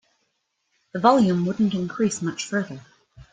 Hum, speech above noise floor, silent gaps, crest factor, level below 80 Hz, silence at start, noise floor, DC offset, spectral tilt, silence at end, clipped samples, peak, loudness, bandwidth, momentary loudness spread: none; 52 dB; none; 22 dB; -60 dBFS; 0.95 s; -74 dBFS; under 0.1%; -5.5 dB/octave; 0.1 s; under 0.1%; -2 dBFS; -22 LUFS; 9.4 kHz; 17 LU